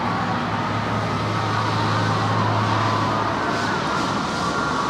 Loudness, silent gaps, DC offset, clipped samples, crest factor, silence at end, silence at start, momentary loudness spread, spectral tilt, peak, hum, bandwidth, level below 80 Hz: -22 LUFS; none; under 0.1%; under 0.1%; 14 dB; 0 s; 0 s; 3 LU; -5.5 dB/octave; -8 dBFS; none; 12 kHz; -46 dBFS